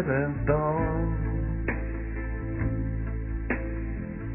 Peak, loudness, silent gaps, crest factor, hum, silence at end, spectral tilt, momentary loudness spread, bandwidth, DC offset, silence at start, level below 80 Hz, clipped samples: -10 dBFS; -30 LUFS; none; 18 dB; none; 0 s; -10.5 dB/octave; 8 LU; 2.9 kHz; under 0.1%; 0 s; -34 dBFS; under 0.1%